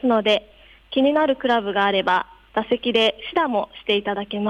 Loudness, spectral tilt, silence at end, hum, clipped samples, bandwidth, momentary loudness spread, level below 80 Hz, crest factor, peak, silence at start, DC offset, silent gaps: -21 LUFS; -5.5 dB/octave; 0 s; none; under 0.1%; 10 kHz; 7 LU; -56 dBFS; 14 dB; -8 dBFS; 0.05 s; under 0.1%; none